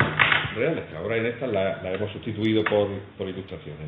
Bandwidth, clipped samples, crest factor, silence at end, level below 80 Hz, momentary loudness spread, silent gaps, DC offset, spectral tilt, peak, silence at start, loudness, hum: 4.9 kHz; under 0.1%; 22 dB; 0 s; -54 dBFS; 14 LU; none; under 0.1%; -8 dB/octave; -4 dBFS; 0 s; -25 LUFS; none